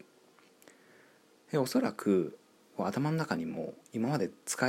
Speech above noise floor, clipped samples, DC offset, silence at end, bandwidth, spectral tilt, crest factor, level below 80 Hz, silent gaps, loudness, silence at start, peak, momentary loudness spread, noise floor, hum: 31 dB; under 0.1%; under 0.1%; 0 s; 16 kHz; -5.5 dB/octave; 20 dB; -78 dBFS; none; -33 LUFS; 1.5 s; -14 dBFS; 10 LU; -63 dBFS; none